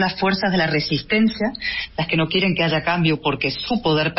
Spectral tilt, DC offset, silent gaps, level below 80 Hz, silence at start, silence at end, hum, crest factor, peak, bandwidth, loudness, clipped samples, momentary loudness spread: -8.5 dB/octave; under 0.1%; none; -46 dBFS; 0 s; 0 s; none; 12 dB; -8 dBFS; 6 kHz; -20 LUFS; under 0.1%; 5 LU